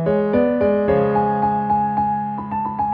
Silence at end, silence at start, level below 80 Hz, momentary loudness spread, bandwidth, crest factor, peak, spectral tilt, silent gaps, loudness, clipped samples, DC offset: 0 s; 0 s; -46 dBFS; 7 LU; 5 kHz; 12 dB; -6 dBFS; -11 dB/octave; none; -19 LUFS; under 0.1%; under 0.1%